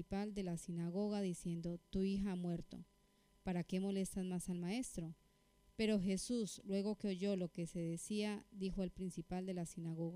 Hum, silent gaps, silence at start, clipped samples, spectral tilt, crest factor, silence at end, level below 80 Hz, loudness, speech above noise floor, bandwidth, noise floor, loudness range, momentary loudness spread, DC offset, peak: none; none; 0 s; under 0.1%; -6 dB/octave; 16 dB; 0 s; -62 dBFS; -43 LUFS; 31 dB; 15.5 kHz; -73 dBFS; 2 LU; 7 LU; under 0.1%; -26 dBFS